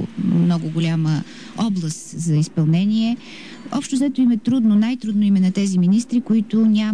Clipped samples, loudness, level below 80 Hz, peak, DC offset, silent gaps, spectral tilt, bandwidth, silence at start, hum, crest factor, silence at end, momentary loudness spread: under 0.1%; -19 LUFS; -60 dBFS; -10 dBFS; 0.5%; none; -6.5 dB/octave; 11 kHz; 0 s; none; 8 dB; 0 s; 9 LU